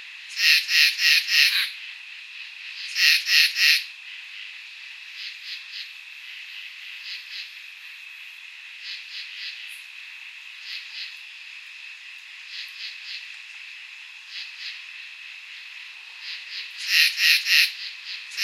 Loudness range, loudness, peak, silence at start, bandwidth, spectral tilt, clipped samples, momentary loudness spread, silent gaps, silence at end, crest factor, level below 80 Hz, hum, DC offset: 17 LU; -20 LUFS; -2 dBFS; 0 s; 16 kHz; 12 dB/octave; under 0.1%; 22 LU; none; 0 s; 26 dB; under -90 dBFS; none; under 0.1%